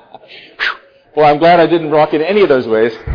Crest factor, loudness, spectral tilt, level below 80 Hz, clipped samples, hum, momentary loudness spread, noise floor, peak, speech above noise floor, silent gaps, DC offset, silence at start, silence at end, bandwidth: 10 dB; -12 LUFS; -7.5 dB/octave; -44 dBFS; under 0.1%; none; 10 LU; -37 dBFS; -2 dBFS; 27 dB; none; under 0.1%; 0.3 s; 0 s; 5.4 kHz